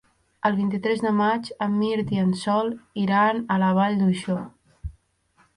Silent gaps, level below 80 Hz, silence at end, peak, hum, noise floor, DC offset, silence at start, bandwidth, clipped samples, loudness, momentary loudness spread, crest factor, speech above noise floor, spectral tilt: none; -50 dBFS; 0.65 s; -8 dBFS; none; -63 dBFS; under 0.1%; 0.45 s; 11 kHz; under 0.1%; -23 LUFS; 13 LU; 16 dB; 41 dB; -7 dB/octave